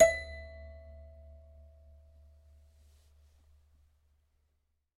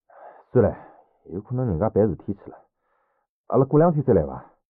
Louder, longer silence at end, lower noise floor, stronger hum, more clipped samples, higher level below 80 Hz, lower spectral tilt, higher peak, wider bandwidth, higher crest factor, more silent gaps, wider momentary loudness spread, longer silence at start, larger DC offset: second, -33 LUFS vs -22 LUFS; first, 4.35 s vs 0.3 s; first, -78 dBFS vs -72 dBFS; neither; neither; about the same, -54 dBFS vs -50 dBFS; second, -3 dB/octave vs -13 dB/octave; second, -10 dBFS vs -6 dBFS; first, 15 kHz vs 2.7 kHz; first, 28 dB vs 18 dB; second, none vs 3.29-3.44 s; first, 22 LU vs 18 LU; second, 0 s vs 0.2 s; neither